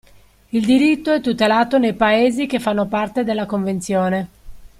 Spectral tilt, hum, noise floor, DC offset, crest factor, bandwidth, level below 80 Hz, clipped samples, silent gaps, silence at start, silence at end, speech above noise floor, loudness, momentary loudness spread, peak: -5.5 dB/octave; none; -49 dBFS; under 0.1%; 14 dB; 15 kHz; -48 dBFS; under 0.1%; none; 0.55 s; 0.1 s; 32 dB; -18 LUFS; 7 LU; -4 dBFS